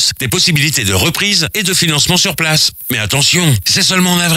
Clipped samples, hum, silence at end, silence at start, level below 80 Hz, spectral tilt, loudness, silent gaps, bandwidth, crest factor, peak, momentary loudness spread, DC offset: under 0.1%; none; 0 s; 0 s; -40 dBFS; -2.5 dB/octave; -11 LUFS; none; 16.5 kHz; 12 dB; 0 dBFS; 3 LU; under 0.1%